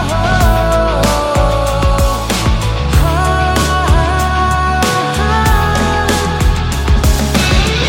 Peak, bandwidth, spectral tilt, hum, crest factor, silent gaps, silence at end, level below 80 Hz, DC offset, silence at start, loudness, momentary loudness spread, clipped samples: 0 dBFS; 17 kHz; -5 dB/octave; none; 12 dB; none; 0 s; -16 dBFS; under 0.1%; 0 s; -13 LUFS; 3 LU; under 0.1%